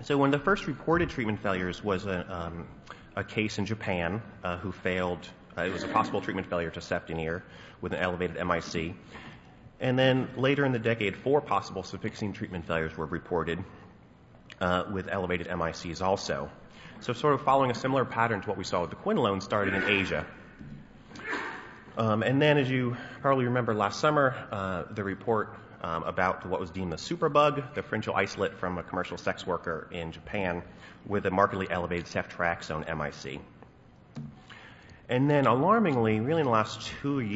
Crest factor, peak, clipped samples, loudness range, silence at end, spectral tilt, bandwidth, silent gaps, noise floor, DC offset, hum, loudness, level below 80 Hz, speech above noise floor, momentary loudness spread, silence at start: 22 dB; -8 dBFS; under 0.1%; 6 LU; 0 s; -6 dB/octave; 8 kHz; none; -55 dBFS; under 0.1%; none; -29 LUFS; -56 dBFS; 26 dB; 15 LU; 0 s